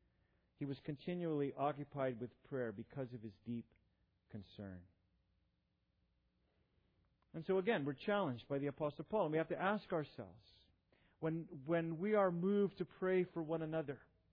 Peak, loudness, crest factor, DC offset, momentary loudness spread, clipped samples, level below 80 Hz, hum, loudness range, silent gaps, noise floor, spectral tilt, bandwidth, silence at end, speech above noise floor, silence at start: -24 dBFS; -41 LUFS; 18 dB; under 0.1%; 16 LU; under 0.1%; -78 dBFS; none; 16 LU; none; -83 dBFS; -6 dB/octave; 5.2 kHz; 0.35 s; 42 dB; 0.6 s